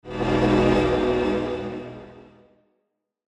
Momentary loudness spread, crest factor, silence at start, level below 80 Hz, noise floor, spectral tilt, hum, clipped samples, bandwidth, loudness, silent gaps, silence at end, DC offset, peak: 17 LU; 16 dB; 0.05 s; -40 dBFS; -76 dBFS; -7 dB/octave; none; under 0.1%; 10.5 kHz; -22 LUFS; none; 1.05 s; under 0.1%; -8 dBFS